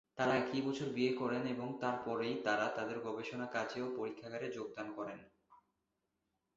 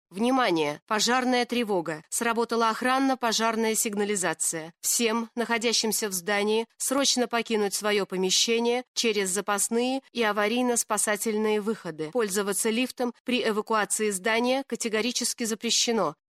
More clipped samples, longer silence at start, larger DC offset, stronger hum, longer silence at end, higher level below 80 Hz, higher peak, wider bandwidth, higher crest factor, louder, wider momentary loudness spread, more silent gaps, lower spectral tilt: neither; about the same, 0.15 s vs 0.1 s; neither; neither; first, 1 s vs 0.2 s; second, -78 dBFS vs -72 dBFS; second, -18 dBFS vs -10 dBFS; second, 7.6 kHz vs 15.5 kHz; about the same, 20 dB vs 16 dB; second, -39 LUFS vs -25 LUFS; first, 9 LU vs 5 LU; second, none vs 0.82-0.87 s, 8.88-8.95 s, 13.20-13.25 s; first, -4 dB/octave vs -2 dB/octave